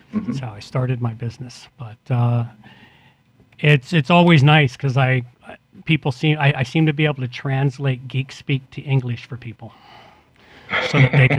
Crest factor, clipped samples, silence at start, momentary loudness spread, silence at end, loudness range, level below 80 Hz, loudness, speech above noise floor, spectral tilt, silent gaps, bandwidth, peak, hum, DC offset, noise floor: 20 dB; under 0.1%; 0.15 s; 20 LU; 0 s; 9 LU; -54 dBFS; -19 LUFS; 35 dB; -7 dB/octave; none; 9.2 kHz; 0 dBFS; none; under 0.1%; -54 dBFS